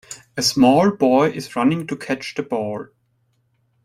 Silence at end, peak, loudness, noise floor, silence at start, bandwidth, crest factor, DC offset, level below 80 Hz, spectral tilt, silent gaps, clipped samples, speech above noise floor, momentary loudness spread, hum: 1 s; -2 dBFS; -19 LUFS; -65 dBFS; 0.1 s; 15.5 kHz; 18 dB; under 0.1%; -58 dBFS; -5 dB/octave; none; under 0.1%; 47 dB; 12 LU; none